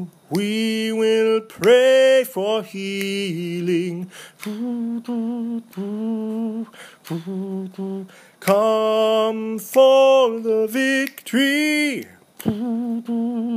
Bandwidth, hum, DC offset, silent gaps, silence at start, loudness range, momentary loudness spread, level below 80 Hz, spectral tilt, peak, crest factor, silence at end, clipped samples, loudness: 15.5 kHz; none; under 0.1%; none; 0 s; 10 LU; 15 LU; -68 dBFS; -5 dB/octave; -2 dBFS; 18 dB; 0 s; under 0.1%; -20 LUFS